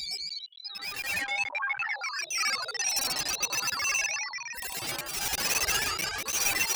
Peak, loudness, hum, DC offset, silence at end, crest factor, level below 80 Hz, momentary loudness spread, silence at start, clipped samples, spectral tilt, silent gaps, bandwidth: -14 dBFS; -29 LUFS; none; under 0.1%; 0 s; 16 dB; -56 dBFS; 9 LU; 0 s; under 0.1%; 1 dB/octave; none; over 20 kHz